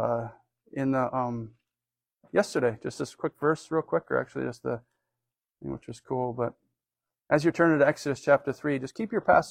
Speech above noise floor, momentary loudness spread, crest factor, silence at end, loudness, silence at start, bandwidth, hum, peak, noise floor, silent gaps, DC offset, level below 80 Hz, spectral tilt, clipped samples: over 63 dB; 15 LU; 20 dB; 0 s; -28 LUFS; 0 s; 14.5 kHz; none; -8 dBFS; under -90 dBFS; none; under 0.1%; -62 dBFS; -6.5 dB/octave; under 0.1%